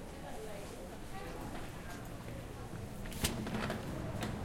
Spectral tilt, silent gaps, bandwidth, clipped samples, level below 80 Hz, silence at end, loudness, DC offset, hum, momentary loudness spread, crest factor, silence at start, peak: -4.5 dB/octave; none; 16.5 kHz; under 0.1%; -50 dBFS; 0 s; -43 LUFS; under 0.1%; none; 9 LU; 24 dB; 0 s; -18 dBFS